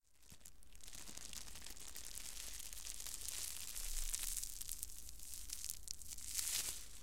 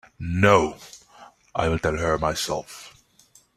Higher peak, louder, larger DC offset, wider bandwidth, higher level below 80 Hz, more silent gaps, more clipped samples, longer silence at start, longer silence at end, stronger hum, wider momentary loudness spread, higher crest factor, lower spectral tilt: second, -16 dBFS vs -2 dBFS; second, -45 LUFS vs -23 LUFS; first, 0.3% vs under 0.1%; first, 17 kHz vs 15 kHz; second, -54 dBFS vs -44 dBFS; neither; neither; second, 0 s vs 0.2 s; second, 0 s vs 0.65 s; neither; second, 13 LU vs 23 LU; first, 32 dB vs 22 dB; second, 0.5 dB/octave vs -5 dB/octave